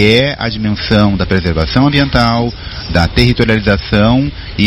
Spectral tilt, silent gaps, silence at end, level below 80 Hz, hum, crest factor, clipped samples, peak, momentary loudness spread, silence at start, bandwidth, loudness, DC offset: -7 dB/octave; none; 0 s; -24 dBFS; none; 12 dB; 0.6%; 0 dBFS; 6 LU; 0 s; 12.5 kHz; -12 LUFS; under 0.1%